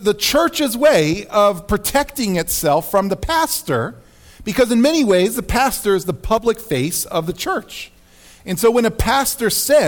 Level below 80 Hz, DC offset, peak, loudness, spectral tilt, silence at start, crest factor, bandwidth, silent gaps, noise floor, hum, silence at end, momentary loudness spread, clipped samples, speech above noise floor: -34 dBFS; under 0.1%; -4 dBFS; -17 LUFS; -4 dB/octave; 0 s; 14 dB; 19.5 kHz; none; -46 dBFS; none; 0 s; 9 LU; under 0.1%; 29 dB